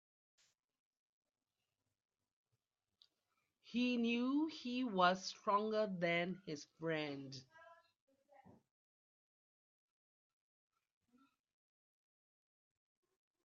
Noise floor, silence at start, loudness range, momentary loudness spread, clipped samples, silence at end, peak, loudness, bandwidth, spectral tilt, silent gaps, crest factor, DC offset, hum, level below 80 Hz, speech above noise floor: under -90 dBFS; 3.65 s; 12 LU; 14 LU; under 0.1%; 5.7 s; -20 dBFS; -39 LUFS; 7.4 kHz; -3.5 dB/octave; none; 24 dB; under 0.1%; none; -88 dBFS; over 51 dB